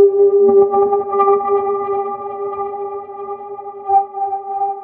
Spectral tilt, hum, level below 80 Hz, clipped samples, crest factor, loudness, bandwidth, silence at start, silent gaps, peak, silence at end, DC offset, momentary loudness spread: -11.5 dB/octave; none; -62 dBFS; under 0.1%; 14 dB; -16 LUFS; 2.5 kHz; 0 s; none; -2 dBFS; 0 s; under 0.1%; 17 LU